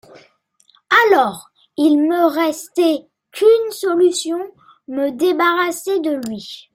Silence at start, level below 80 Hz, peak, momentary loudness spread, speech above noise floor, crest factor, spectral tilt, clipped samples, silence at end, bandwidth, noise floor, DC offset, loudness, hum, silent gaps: 0.9 s; -68 dBFS; 0 dBFS; 14 LU; 41 dB; 16 dB; -3 dB/octave; under 0.1%; 0.15 s; 16.5 kHz; -57 dBFS; under 0.1%; -16 LUFS; none; none